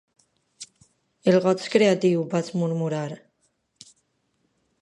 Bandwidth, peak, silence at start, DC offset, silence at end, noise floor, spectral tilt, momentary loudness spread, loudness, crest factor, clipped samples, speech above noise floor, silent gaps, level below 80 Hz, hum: 11 kHz; -4 dBFS; 0.6 s; under 0.1%; 1.65 s; -71 dBFS; -6 dB/octave; 23 LU; -23 LUFS; 20 dB; under 0.1%; 50 dB; none; -72 dBFS; none